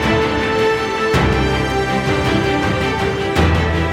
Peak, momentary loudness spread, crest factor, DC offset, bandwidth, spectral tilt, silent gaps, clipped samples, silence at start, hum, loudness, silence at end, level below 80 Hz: -2 dBFS; 2 LU; 14 dB; under 0.1%; 16 kHz; -6 dB/octave; none; under 0.1%; 0 s; none; -16 LUFS; 0 s; -26 dBFS